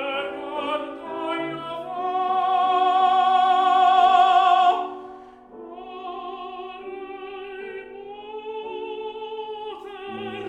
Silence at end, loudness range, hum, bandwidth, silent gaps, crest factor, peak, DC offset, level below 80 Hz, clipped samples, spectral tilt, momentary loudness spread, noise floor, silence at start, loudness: 0 s; 17 LU; none; 8.6 kHz; none; 16 dB; -6 dBFS; under 0.1%; -64 dBFS; under 0.1%; -4 dB/octave; 20 LU; -43 dBFS; 0 s; -21 LUFS